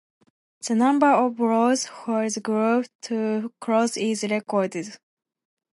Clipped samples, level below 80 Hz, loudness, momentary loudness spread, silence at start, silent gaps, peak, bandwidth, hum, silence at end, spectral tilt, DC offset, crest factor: under 0.1%; -78 dBFS; -23 LUFS; 10 LU; 0.65 s; 2.95-2.99 s; -6 dBFS; 11.5 kHz; none; 0.8 s; -4.5 dB/octave; under 0.1%; 18 dB